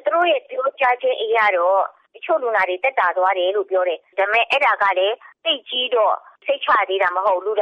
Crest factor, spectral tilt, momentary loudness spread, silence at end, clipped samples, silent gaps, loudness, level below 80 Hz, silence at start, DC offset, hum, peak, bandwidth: 14 dB; -2.5 dB/octave; 6 LU; 0 s; under 0.1%; none; -19 LUFS; -68 dBFS; 0.05 s; under 0.1%; none; -6 dBFS; 6.8 kHz